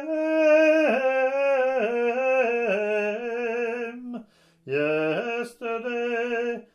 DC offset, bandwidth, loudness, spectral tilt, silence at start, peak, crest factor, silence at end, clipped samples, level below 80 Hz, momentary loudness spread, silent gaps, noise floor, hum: under 0.1%; 11 kHz; -24 LUFS; -5.5 dB/octave; 0 s; -10 dBFS; 14 dB; 0.1 s; under 0.1%; -76 dBFS; 11 LU; none; -48 dBFS; none